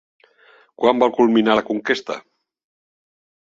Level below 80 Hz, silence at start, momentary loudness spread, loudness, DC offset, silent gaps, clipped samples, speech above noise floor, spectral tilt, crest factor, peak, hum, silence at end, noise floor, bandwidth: -62 dBFS; 0.8 s; 11 LU; -18 LUFS; under 0.1%; none; under 0.1%; 36 dB; -5.5 dB/octave; 20 dB; -2 dBFS; none; 1.2 s; -53 dBFS; 7.6 kHz